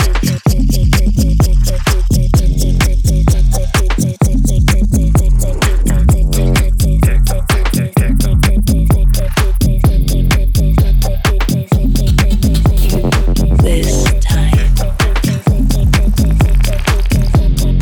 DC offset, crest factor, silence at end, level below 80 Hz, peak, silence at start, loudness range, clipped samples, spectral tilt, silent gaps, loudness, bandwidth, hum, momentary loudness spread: under 0.1%; 8 dB; 0 s; -12 dBFS; -2 dBFS; 0 s; 1 LU; under 0.1%; -5.5 dB/octave; none; -13 LUFS; 18 kHz; none; 2 LU